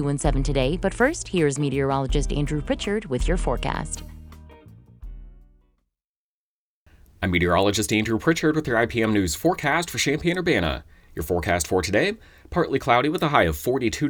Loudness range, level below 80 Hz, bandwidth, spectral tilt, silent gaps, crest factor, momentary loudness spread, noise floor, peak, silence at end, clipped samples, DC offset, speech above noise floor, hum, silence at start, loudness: 9 LU; -34 dBFS; over 20 kHz; -5 dB/octave; 6.05-6.86 s; 22 dB; 8 LU; under -90 dBFS; -2 dBFS; 0 s; under 0.1%; under 0.1%; over 68 dB; none; 0 s; -23 LUFS